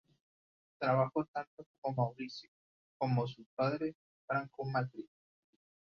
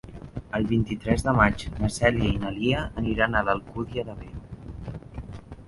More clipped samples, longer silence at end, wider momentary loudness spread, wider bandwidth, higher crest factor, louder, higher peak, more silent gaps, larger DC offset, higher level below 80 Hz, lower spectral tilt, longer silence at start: neither; first, 0.9 s vs 0 s; second, 13 LU vs 18 LU; second, 6.8 kHz vs 11.5 kHz; about the same, 22 dB vs 22 dB; second, -37 LUFS vs -25 LUFS; second, -16 dBFS vs -4 dBFS; first, 1.28-1.34 s, 1.47-1.57 s, 1.66-1.82 s, 2.48-3.00 s, 3.46-3.57 s, 3.95-4.28 s vs none; neither; second, -76 dBFS vs -38 dBFS; about the same, -6 dB/octave vs -6 dB/octave; first, 0.8 s vs 0.05 s